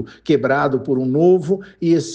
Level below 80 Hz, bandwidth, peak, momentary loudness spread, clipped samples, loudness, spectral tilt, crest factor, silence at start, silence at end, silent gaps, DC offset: -56 dBFS; 9 kHz; -4 dBFS; 5 LU; under 0.1%; -17 LUFS; -7 dB/octave; 14 dB; 0 s; 0 s; none; under 0.1%